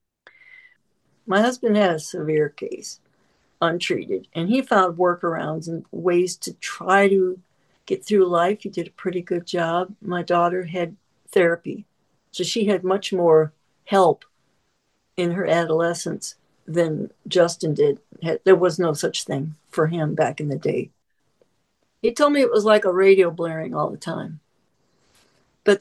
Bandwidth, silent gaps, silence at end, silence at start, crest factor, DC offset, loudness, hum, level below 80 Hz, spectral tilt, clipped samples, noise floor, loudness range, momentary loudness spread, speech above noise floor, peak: 12.5 kHz; none; 0 s; 1.25 s; 20 dB; under 0.1%; -21 LUFS; none; -70 dBFS; -5.5 dB/octave; under 0.1%; -70 dBFS; 4 LU; 13 LU; 50 dB; -2 dBFS